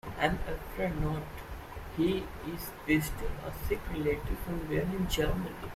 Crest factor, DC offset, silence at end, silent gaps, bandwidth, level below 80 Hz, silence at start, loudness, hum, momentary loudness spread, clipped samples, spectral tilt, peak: 22 dB; under 0.1%; 0 s; none; 16 kHz; -42 dBFS; 0.05 s; -34 LUFS; none; 10 LU; under 0.1%; -5.5 dB/octave; -12 dBFS